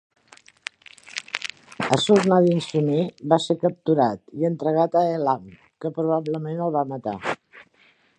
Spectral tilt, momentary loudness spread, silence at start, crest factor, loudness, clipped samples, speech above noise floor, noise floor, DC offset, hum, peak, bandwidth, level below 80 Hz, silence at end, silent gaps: -6 dB/octave; 16 LU; 1.15 s; 22 dB; -23 LUFS; under 0.1%; 38 dB; -59 dBFS; under 0.1%; none; -2 dBFS; 10.5 kHz; -66 dBFS; 0.55 s; none